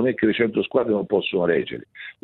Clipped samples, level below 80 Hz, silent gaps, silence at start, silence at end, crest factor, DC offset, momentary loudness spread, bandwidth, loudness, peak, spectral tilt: under 0.1%; -60 dBFS; none; 0 s; 0.1 s; 16 dB; under 0.1%; 12 LU; 4.2 kHz; -22 LUFS; -6 dBFS; -9.5 dB/octave